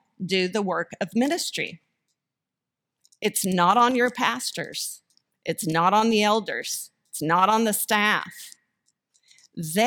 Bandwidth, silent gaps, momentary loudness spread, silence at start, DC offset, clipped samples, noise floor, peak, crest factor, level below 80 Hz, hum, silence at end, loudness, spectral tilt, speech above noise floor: 19 kHz; none; 15 LU; 0.2 s; under 0.1%; under 0.1%; -86 dBFS; -6 dBFS; 20 dB; -70 dBFS; none; 0 s; -23 LUFS; -3.5 dB/octave; 63 dB